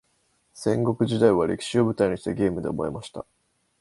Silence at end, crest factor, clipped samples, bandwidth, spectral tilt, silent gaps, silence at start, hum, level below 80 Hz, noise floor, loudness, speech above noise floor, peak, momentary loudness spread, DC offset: 0.6 s; 20 dB; under 0.1%; 11.5 kHz; -6.5 dB/octave; none; 0.55 s; none; -52 dBFS; -68 dBFS; -24 LUFS; 45 dB; -4 dBFS; 16 LU; under 0.1%